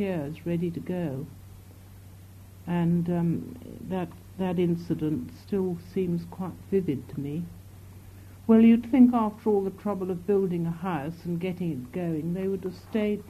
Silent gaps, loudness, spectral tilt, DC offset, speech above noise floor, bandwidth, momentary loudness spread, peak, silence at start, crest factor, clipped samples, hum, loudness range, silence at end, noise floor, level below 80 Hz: none; -27 LUFS; -9 dB/octave; under 0.1%; 21 dB; 14 kHz; 18 LU; -8 dBFS; 0 s; 20 dB; under 0.1%; none; 8 LU; 0 s; -48 dBFS; -56 dBFS